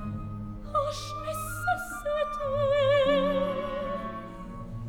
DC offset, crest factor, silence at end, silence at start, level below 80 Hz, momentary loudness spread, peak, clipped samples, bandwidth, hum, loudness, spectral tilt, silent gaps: under 0.1%; 16 dB; 0 s; 0 s; -44 dBFS; 16 LU; -12 dBFS; under 0.1%; 17.5 kHz; none; -29 LUFS; -5.5 dB/octave; none